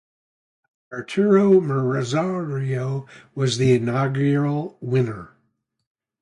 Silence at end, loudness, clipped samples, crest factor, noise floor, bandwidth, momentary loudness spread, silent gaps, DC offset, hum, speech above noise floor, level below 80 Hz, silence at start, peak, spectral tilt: 0.95 s; -21 LUFS; under 0.1%; 18 dB; -71 dBFS; 11 kHz; 13 LU; none; under 0.1%; none; 50 dB; -60 dBFS; 0.9 s; -4 dBFS; -7 dB/octave